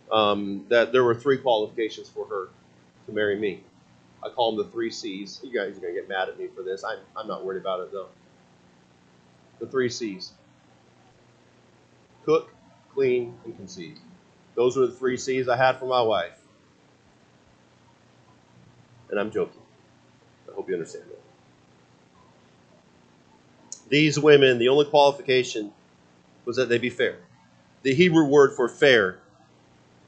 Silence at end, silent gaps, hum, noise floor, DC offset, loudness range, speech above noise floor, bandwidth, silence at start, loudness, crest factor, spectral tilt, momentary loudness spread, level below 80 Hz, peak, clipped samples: 0.9 s; none; 60 Hz at -60 dBFS; -58 dBFS; under 0.1%; 15 LU; 35 dB; 8.6 kHz; 0.1 s; -23 LUFS; 24 dB; -5 dB/octave; 20 LU; -72 dBFS; -2 dBFS; under 0.1%